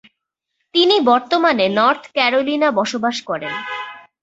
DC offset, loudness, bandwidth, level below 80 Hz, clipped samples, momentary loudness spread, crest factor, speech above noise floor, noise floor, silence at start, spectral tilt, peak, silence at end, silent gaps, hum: under 0.1%; -17 LUFS; 8 kHz; -64 dBFS; under 0.1%; 11 LU; 16 dB; 59 dB; -76 dBFS; 0.75 s; -4 dB/octave; -2 dBFS; 0.25 s; none; none